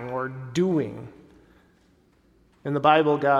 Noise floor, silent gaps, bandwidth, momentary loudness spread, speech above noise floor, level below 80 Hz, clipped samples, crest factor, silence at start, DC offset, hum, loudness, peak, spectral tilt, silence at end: -61 dBFS; none; 12.5 kHz; 20 LU; 40 dB; -62 dBFS; under 0.1%; 20 dB; 0 s; under 0.1%; none; -23 LUFS; -4 dBFS; -6.5 dB/octave; 0 s